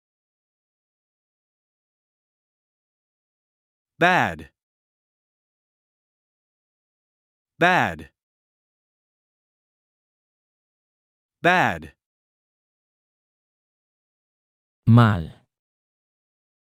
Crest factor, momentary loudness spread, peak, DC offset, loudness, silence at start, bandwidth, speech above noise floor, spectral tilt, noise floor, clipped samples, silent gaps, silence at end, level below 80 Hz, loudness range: 26 dB; 19 LU; -2 dBFS; under 0.1%; -20 LUFS; 4 s; 13.5 kHz; over 71 dB; -6.5 dB/octave; under -90 dBFS; under 0.1%; 4.63-7.45 s, 8.23-11.29 s, 12.06-14.82 s; 1.5 s; -58 dBFS; 4 LU